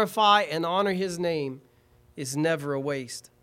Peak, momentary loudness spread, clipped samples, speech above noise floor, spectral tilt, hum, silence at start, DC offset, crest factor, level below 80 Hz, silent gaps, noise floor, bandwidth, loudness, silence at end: -8 dBFS; 16 LU; under 0.1%; 33 dB; -4 dB/octave; none; 0 s; under 0.1%; 20 dB; -66 dBFS; none; -60 dBFS; 16.5 kHz; -26 LUFS; 0.2 s